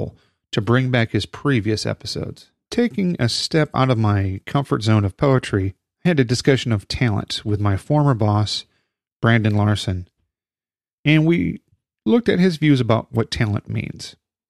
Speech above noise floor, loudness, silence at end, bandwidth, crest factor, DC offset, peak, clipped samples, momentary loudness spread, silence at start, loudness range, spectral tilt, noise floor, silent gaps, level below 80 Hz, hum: over 71 dB; -20 LUFS; 0.4 s; 12 kHz; 18 dB; under 0.1%; -2 dBFS; under 0.1%; 10 LU; 0 s; 2 LU; -6.5 dB/octave; under -90 dBFS; 9.16-9.20 s, 10.93-11.04 s; -46 dBFS; none